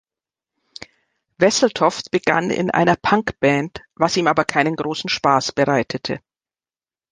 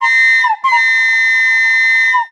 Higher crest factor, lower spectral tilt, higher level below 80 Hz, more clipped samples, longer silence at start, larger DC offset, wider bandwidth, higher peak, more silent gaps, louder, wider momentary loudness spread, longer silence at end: first, 20 dB vs 10 dB; first, -4.5 dB/octave vs 4.5 dB/octave; first, -54 dBFS vs -78 dBFS; neither; first, 0.8 s vs 0 s; neither; second, 11 kHz vs 13 kHz; about the same, 0 dBFS vs -2 dBFS; neither; second, -18 LUFS vs -9 LUFS; first, 11 LU vs 3 LU; first, 0.95 s vs 0.05 s